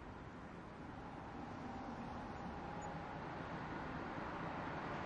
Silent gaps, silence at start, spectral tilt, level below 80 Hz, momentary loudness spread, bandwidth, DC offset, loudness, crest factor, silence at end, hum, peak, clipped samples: none; 0 s; -6.5 dB/octave; -62 dBFS; 7 LU; 10.5 kHz; under 0.1%; -48 LUFS; 14 dB; 0 s; none; -34 dBFS; under 0.1%